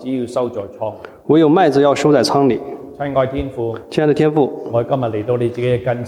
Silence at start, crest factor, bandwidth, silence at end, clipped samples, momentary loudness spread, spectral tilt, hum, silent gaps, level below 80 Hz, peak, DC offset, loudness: 0 s; 14 dB; 13.5 kHz; 0 s; under 0.1%; 13 LU; -6.5 dB/octave; none; none; -44 dBFS; -2 dBFS; under 0.1%; -16 LUFS